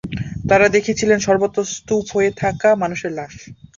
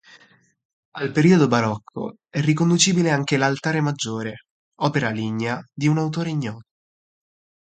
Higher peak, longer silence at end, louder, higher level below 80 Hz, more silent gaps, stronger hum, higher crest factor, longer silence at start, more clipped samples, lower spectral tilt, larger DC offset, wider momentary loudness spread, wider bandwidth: first, 0 dBFS vs -4 dBFS; second, 0.25 s vs 1.15 s; first, -17 LUFS vs -21 LUFS; first, -44 dBFS vs -62 dBFS; second, none vs 4.50-4.72 s; neither; about the same, 18 dB vs 20 dB; second, 0.05 s vs 0.95 s; neither; about the same, -5 dB/octave vs -5 dB/octave; neither; about the same, 13 LU vs 14 LU; second, 7.6 kHz vs 9.4 kHz